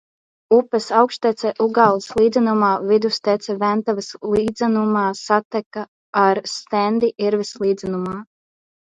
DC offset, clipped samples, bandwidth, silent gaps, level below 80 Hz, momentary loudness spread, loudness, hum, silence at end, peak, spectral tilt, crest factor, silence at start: under 0.1%; under 0.1%; 9.4 kHz; 5.45-5.51 s, 5.66-5.71 s, 5.88-6.13 s; -56 dBFS; 9 LU; -19 LUFS; none; 0.6 s; 0 dBFS; -5.5 dB/octave; 18 dB; 0.5 s